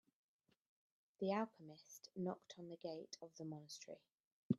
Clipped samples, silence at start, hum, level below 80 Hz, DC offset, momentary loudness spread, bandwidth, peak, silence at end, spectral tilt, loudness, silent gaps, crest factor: under 0.1%; 1.2 s; none; -86 dBFS; under 0.1%; 16 LU; 12.5 kHz; -24 dBFS; 0 s; -6 dB/octave; -49 LUFS; 4.12-4.50 s; 24 dB